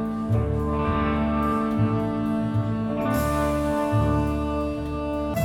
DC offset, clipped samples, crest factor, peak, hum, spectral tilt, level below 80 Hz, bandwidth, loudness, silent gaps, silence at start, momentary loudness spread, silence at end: under 0.1%; under 0.1%; 14 dB; -10 dBFS; none; -7.5 dB/octave; -34 dBFS; 17.5 kHz; -24 LUFS; none; 0 s; 4 LU; 0 s